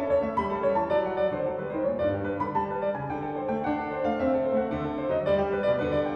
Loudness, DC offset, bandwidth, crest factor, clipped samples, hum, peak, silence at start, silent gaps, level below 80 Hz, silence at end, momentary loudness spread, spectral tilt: -28 LUFS; under 0.1%; 6 kHz; 14 dB; under 0.1%; none; -12 dBFS; 0 s; none; -52 dBFS; 0 s; 5 LU; -8.5 dB/octave